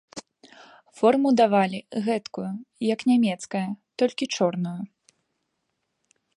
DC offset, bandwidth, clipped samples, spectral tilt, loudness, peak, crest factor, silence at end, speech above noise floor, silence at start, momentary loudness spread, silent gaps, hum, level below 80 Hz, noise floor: under 0.1%; 11 kHz; under 0.1%; -5.5 dB/octave; -24 LUFS; -6 dBFS; 20 dB; 1.5 s; 54 dB; 0.15 s; 15 LU; none; none; -74 dBFS; -77 dBFS